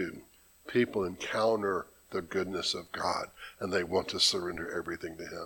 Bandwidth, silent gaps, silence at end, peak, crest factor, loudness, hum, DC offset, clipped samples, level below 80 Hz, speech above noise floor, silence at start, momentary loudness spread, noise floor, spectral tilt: 17 kHz; none; 0 s; -12 dBFS; 20 dB; -32 LUFS; none; under 0.1%; under 0.1%; -62 dBFS; 24 dB; 0 s; 13 LU; -57 dBFS; -3.5 dB/octave